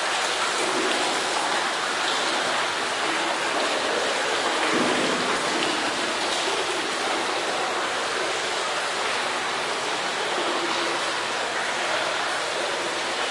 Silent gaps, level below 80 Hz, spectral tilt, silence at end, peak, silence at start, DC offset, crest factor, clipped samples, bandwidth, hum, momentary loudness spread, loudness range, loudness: none; -66 dBFS; -1 dB/octave; 0 s; -8 dBFS; 0 s; under 0.1%; 18 dB; under 0.1%; 12 kHz; none; 3 LU; 2 LU; -24 LUFS